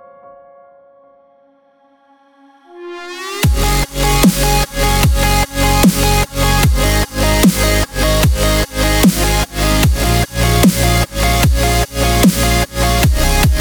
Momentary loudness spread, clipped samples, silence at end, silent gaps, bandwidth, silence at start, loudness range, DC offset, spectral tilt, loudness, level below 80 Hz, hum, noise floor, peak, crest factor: 4 LU; under 0.1%; 0 s; none; over 20 kHz; 2.75 s; 5 LU; under 0.1%; -4.5 dB/octave; -13 LUFS; -18 dBFS; none; -52 dBFS; 0 dBFS; 14 dB